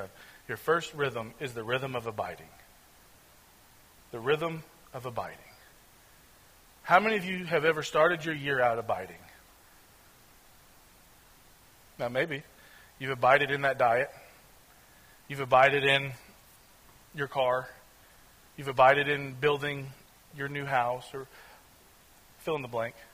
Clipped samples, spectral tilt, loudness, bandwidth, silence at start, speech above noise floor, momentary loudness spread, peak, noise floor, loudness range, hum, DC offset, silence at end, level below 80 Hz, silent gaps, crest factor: under 0.1%; -5 dB/octave; -29 LUFS; 16 kHz; 0 s; 29 dB; 20 LU; -6 dBFS; -58 dBFS; 9 LU; none; under 0.1%; 0.1 s; -64 dBFS; none; 24 dB